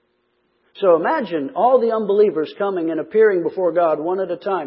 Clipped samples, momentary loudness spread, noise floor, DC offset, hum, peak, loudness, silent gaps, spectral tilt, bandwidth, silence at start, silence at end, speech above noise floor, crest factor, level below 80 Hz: under 0.1%; 7 LU; -66 dBFS; under 0.1%; none; -2 dBFS; -18 LUFS; none; -11 dB/octave; 5.6 kHz; 0.75 s; 0 s; 48 dB; 16 dB; -74 dBFS